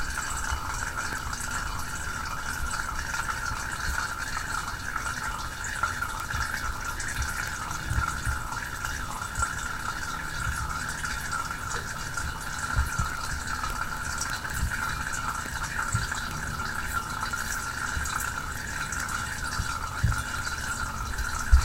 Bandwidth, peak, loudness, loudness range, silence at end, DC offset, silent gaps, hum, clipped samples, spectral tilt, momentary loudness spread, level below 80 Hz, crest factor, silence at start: 17 kHz; -4 dBFS; -31 LUFS; 1 LU; 0 s; under 0.1%; none; none; under 0.1%; -2.5 dB/octave; 3 LU; -36 dBFS; 26 dB; 0 s